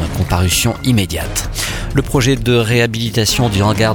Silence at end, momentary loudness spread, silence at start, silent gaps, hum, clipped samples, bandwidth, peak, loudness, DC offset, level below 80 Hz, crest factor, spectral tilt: 0 s; 6 LU; 0 s; none; none; under 0.1%; 19 kHz; 0 dBFS; -15 LUFS; under 0.1%; -26 dBFS; 14 dB; -4.5 dB/octave